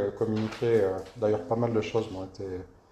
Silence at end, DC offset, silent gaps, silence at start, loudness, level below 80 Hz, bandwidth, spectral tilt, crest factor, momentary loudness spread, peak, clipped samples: 0.25 s; under 0.1%; none; 0 s; -29 LUFS; -58 dBFS; 10 kHz; -7.5 dB/octave; 16 dB; 12 LU; -12 dBFS; under 0.1%